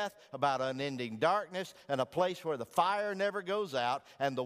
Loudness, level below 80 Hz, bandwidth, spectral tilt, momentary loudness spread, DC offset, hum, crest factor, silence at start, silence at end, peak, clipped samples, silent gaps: -34 LUFS; -78 dBFS; 15.5 kHz; -5 dB/octave; 6 LU; under 0.1%; none; 20 dB; 0 s; 0 s; -14 dBFS; under 0.1%; none